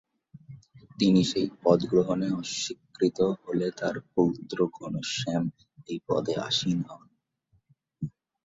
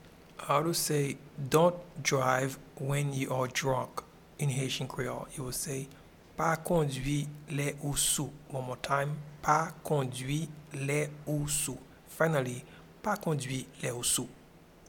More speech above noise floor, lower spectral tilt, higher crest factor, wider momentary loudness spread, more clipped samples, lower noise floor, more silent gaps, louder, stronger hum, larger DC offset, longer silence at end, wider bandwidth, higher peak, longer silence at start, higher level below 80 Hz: first, 43 dB vs 24 dB; first, -5.5 dB/octave vs -4 dB/octave; about the same, 22 dB vs 22 dB; first, 14 LU vs 11 LU; neither; first, -70 dBFS vs -56 dBFS; neither; first, -28 LUFS vs -32 LUFS; neither; neither; first, 0.35 s vs 0.05 s; second, 7.8 kHz vs 18.5 kHz; first, -6 dBFS vs -10 dBFS; first, 0.35 s vs 0 s; second, -62 dBFS vs -56 dBFS